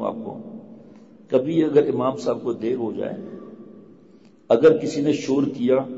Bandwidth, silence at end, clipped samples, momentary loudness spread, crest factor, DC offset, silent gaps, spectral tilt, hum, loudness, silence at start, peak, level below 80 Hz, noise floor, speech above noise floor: 8 kHz; 0 s; under 0.1%; 21 LU; 18 dB; 0.1%; none; -7 dB/octave; none; -21 LUFS; 0 s; -6 dBFS; -66 dBFS; -51 dBFS; 31 dB